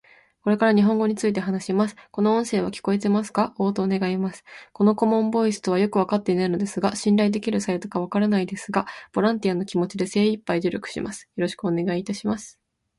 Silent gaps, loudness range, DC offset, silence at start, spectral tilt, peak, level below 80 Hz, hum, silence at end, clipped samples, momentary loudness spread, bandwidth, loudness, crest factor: none; 3 LU; under 0.1%; 0.45 s; -6 dB/octave; -6 dBFS; -62 dBFS; none; 0.5 s; under 0.1%; 8 LU; 11.5 kHz; -23 LUFS; 16 dB